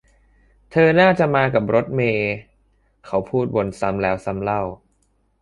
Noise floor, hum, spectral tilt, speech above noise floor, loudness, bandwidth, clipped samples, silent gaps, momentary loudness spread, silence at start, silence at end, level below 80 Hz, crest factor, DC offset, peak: -64 dBFS; none; -7.5 dB/octave; 45 dB; -19 LUFS; 11 kHz; under 0.1%; none; 11 LU; 0.7 s; 0.65 s; -48 dBFS; 18 dB; under 0.1%; -2 dBFS